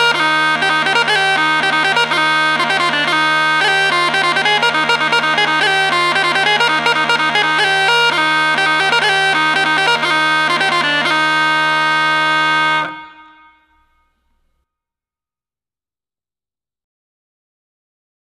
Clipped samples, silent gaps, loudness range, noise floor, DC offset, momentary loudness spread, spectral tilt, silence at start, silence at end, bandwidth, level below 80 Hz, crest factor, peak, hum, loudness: under 0.1%; none; 4 LU; under -90 dBFS; under 0.1%; 1 LU; -2 dB/octave; 0 s; 5.15 s; 14 kHz; -58 dBFS; 14 dB; 0 dBFS; none; -12 LUFS